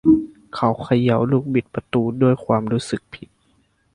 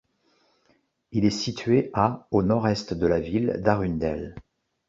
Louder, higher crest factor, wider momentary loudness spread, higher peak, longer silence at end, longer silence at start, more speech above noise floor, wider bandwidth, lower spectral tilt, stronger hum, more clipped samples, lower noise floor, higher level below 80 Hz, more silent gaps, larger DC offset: first, -20 LUFS vs -25 LUFS; about the same, 18 dB vs 20 dB; first, 12 LU vs 6 LU; about the same, -2 dBFS vs -4 dBFS; first, 0.8 s vs 0.5 s; second, 0.05 s vs 1.1 s; about the same, 42 dB vs 43 dB; first, 11 kHz vs 7.8 kHz; first, -8 dB/octave vs -6.5 dB/octave; neither; neither; second, -62 dBFS vs -67 dBFS; about the same, -50 dBFS vs -46 dBFS; neither; neither